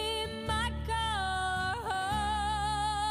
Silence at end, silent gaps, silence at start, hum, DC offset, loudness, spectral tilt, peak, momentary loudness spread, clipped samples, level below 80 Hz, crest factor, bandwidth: 0 s; none; 0 s; none; under 0.1%; -32 LUFS; -3.5 dB/octave; -22 dBFS; 2 LU; under 0.1%; -42 dBFS; 10 dB; 15.5 kHz